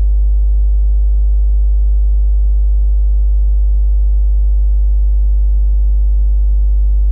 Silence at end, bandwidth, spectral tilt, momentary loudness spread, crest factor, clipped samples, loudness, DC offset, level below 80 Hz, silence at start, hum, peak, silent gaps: 0 s; 0.8 kHz; -11.5 dB/octave; 0 LU; 4 dB; under 0.1%; -15 LUFS; under 0.1%; -10 dBFS; 0 s; none; -6 dBFS; none